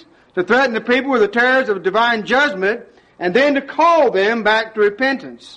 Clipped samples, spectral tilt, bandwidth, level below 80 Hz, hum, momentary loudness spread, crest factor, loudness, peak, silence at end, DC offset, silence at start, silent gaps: under 0.1%; -4.5 dB/octave; 9.4 kHz; -56 dBFS; none; 7 LU; 14 dB; -16 LUFS; -2 dBFS; 0.05 s; under 0.1%; 0.35 s; none